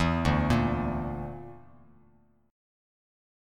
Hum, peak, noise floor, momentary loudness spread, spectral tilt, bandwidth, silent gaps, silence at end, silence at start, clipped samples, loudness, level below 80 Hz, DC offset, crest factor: none; -12 dBFS; -63 dBFS; 18 LU; -7 dB/octave; 13.5 kHz; none; 1.9 s; 0 s; under 0.1%; -28 LUFS; -40 dBFS; under 0.1%; 20 dB